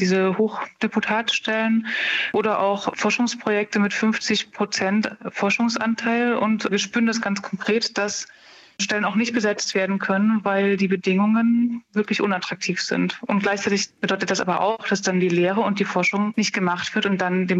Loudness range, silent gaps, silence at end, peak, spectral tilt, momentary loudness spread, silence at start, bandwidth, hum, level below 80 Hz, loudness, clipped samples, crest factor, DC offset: 2 LU; none; 0 s; -6 dBFS; -4.5 dB/octave; 4 LU; 0 s; 8.2 kHz; none; -70 dBFS; -22 LUFS; under 0.1%; 14 dB; under 0.1%